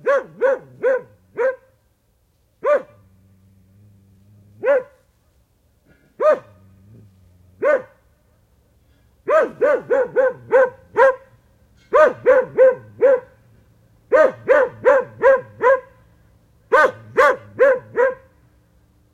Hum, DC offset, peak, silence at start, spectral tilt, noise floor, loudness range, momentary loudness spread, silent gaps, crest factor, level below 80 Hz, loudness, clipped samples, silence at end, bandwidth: none; under 0.1%; -2 dBFS; 0.05 s; -5 dB/octave; -62 dBFS; 9 LU; 8 LU; none; 18 dB; -58 dBFS; -18 LUFS; under 0.1%; 1 s; 7.8 kHz